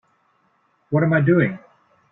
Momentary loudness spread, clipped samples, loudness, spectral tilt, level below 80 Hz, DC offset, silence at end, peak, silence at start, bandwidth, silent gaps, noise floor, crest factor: 9 LU; under 0.1%; -19 LUFS; -11.5 dB/octave; -58 dBFS; under 0.1%; 0.55 s; -6 dBFS; 0.9 s; 3.9 kHz; none; -64 dBFS; 16 dB